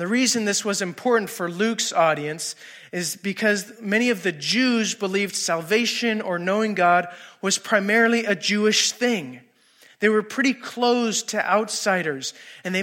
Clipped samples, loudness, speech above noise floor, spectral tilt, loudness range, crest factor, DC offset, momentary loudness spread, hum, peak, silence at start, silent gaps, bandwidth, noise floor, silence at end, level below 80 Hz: under 0.1%; -22 LUFS; 32 dB; -3 dB/octave; 3 LU; 18 dB; under 0.1%; 9 LU; none; -4 dBFS; 0 s; none; 16.5 kHz; -55 dBFS; 0 s; -80 dBFS